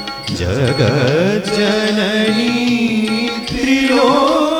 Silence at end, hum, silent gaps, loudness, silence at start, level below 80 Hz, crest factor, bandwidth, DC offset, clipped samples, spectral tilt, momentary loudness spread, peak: 0 s; none; none; -14 LUFS; 0 s; -40 dBFS; 14 dB; 19.5 kHz; under 0.1%; under 0.1%; -5.5 dB/octave; 7 LU; 0 dBFS